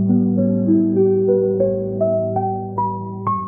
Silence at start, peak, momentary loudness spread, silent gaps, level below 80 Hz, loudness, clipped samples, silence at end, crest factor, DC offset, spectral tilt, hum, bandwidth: 0 s; -6 dBFS; 7 LU; none; -54 dBFS; -18 LUFS; under 0.1%; 0 s; 12 dB; 0.2%; -15 dB/octave; none; 2.3 kHz